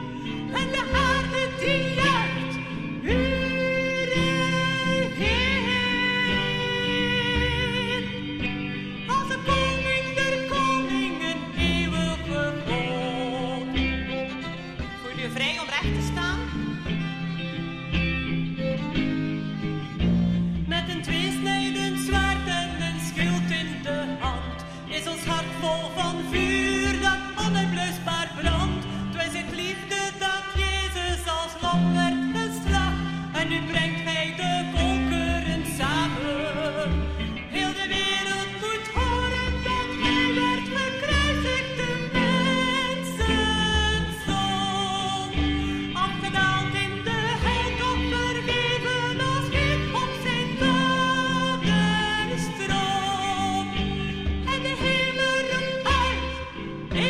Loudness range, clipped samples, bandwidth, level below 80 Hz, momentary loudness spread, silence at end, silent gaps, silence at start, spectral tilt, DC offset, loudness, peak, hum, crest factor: 4 LU; under 0.1%; 15 kHz; -36 dBFS; 7 LU; 0 s; none; 0 s; -4.5 dB/octave; under 0.1%; -25 LUFS; -8 dBFS; none; 18 dB